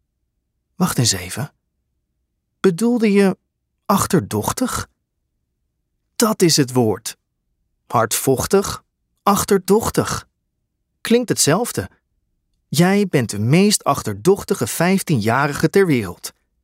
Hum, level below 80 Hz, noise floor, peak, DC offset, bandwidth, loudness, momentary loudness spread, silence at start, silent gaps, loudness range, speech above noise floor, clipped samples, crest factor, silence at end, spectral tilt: none; -48 dBFS; -73 dBFS; -2 dBFS; under 0.1%; 16 kHz; -18 LUFS; 13 LU; 0.8 s; none; 3 LU; 56 dB; under 0.1%; 16 dB; 0.35 s; -4.5 dB/octave